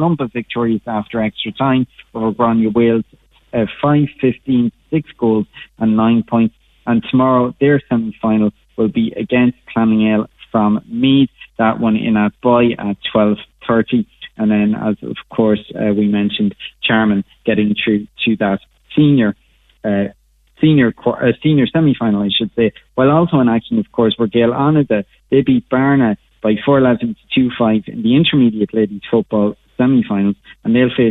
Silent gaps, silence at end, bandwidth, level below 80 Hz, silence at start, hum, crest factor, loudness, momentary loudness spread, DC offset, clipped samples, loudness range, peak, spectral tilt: none; 0 s; 4.1 kHz; -48 dBFS; 0 s; none; 12 dB; -15 LUFS; 7 LU; under 0.1%; under 0.1%; 2 LU; -2 dBFS; -9.5 dB/octave